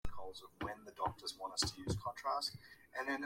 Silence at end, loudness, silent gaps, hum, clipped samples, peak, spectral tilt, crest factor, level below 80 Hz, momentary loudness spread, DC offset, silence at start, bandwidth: 0 s; -42 LUFS; none; none; under 0.1%; -22 dBFS; -3 dB/octave; 20 dB; -58 dBFS; 12 LU; under 0.1%; 0.05 s; 16.5 kHz